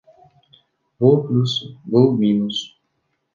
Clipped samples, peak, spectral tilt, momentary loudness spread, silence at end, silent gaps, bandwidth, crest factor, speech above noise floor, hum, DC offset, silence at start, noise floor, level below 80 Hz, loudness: under 0.1%; -2 dBFS; -8 dB/octave; 10 LU; 0.65 s; none; 7.4 kHz; 18 dB; 54 dB; none; under 0.1%; 1 s; -71 dBFS; -62 dBFS; -18 LUFS